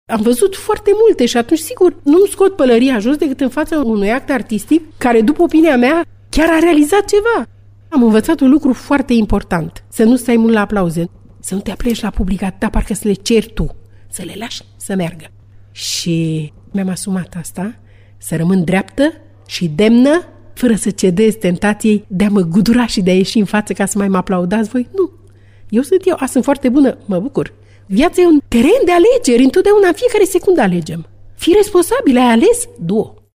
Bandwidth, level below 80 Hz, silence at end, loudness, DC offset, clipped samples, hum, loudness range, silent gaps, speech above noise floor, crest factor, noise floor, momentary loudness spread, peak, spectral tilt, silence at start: 16 kHz; -32 dBFS; 0.3 s; -13 LUFS; under 0.1%; under 0.1%; none; 8 LU; none; 26 dB; 12 dB; -39 dBFS; 12 LU; -2 dBFS; -5.5 dB/octave; 0.1 s